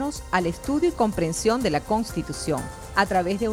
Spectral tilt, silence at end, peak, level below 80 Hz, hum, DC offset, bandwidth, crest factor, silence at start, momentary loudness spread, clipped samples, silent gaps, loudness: -5 dB/octave; 0 s; -6 dBFS; -42 dBFS; none; under 0.1%; 16.5 kHz; 18 dB; 0 s; 6 LU; under 0.1%; none; -24 LUFS